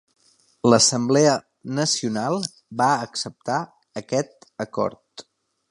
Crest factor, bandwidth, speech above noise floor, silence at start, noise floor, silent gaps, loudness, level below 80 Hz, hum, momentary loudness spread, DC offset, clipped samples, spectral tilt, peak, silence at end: 22 dB; 11.5 kHz; 34 dB; 0.65 s; -56 dBFS; none; -22 LUFS; -64 dBFS; none; 16 LU; under 0.1%; under 0.1%; -3.5 dB/octave; -2 dBFS; 0.5 s